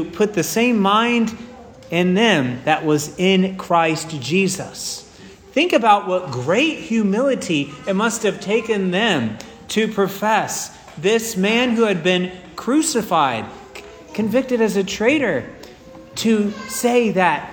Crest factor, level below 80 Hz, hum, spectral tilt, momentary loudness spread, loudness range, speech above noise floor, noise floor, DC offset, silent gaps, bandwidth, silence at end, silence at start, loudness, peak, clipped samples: 18 dB; -54 dBFS; none; -4.5 dB/octave; 12 LU; 2 LU; 24 dB; -42 dBFS; under 0.1%; none; over 20 kHz; 0 s; 0 s; -18 LUFS; 0 dBFS; under 0.1%